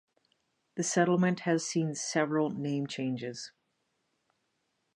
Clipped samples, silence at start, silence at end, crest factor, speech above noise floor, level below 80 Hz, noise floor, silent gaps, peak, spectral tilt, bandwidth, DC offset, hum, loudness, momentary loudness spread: under 0.1%; 0.75 s; 1.45 s; 18 dB; 49 dB; -82 dBFS; -79 dBFS; none; -14 dBFS; -5 dB/octave; 11.5 kHz; under 0.1%; none; -31 LUFS; 13 LU